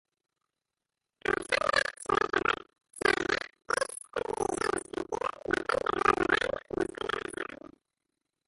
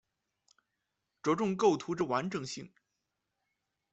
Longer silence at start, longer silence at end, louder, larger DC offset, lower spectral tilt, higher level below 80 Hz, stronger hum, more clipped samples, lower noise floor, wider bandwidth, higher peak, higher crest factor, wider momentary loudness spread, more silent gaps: about the same, 1.3 s vs 1.25 s; second, 0.9 s vs 1.25 s; about the same, -31 LUFS vs -32 LUFS; neither; second, -3 dB/octave vs -5.5 dB/octave; first, -58 dBFS vs -74 dBFS; neither; neither; first, -89 dBFS vs -85 dBFS; first, 12 kHz vs 8.2 kHz; first, -10 dBFS vs -14 dBFS; about the same, 22 dB vs 20 dB; about the same, 10 LU vs 12 LU; neither